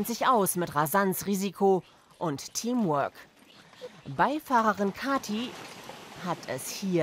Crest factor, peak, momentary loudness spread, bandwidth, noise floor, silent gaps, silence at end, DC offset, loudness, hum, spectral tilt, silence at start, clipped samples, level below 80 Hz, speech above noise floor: 18 dB; -10 dBFS; 17 LU; 16 kHz; -55 dBFS; none; 0 s; under 0.1%; -28 LUFS; none; -4.5 dB/octave; 0 s; under 0.1%; -68 dBFS; 27 dB